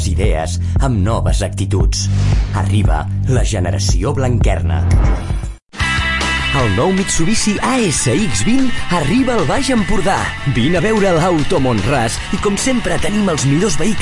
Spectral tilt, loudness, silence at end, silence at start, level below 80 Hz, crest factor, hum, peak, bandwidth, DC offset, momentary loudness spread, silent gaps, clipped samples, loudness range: -5 dB/octave; -15 LUFS; 0 s; 0 s; -22 dBFS; 10 dB; none; -4 dBFS; 11.5 kHz; under 0.1%; 4 LU; 5.62-5.67 s; under 0.1%; 1 LU